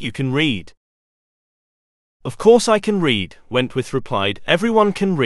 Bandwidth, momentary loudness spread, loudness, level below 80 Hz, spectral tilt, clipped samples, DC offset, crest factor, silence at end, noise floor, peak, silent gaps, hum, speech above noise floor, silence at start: 12 kHz; 9 LU; -18 LUFS; -50 dBFS; -5 dB/octave; under 0.1%; under 0.1%; 18 dB; 0 s; under -90 dBFS; 0 dBFS; 0.77-2.20 s; none; over 73 dB; 0 s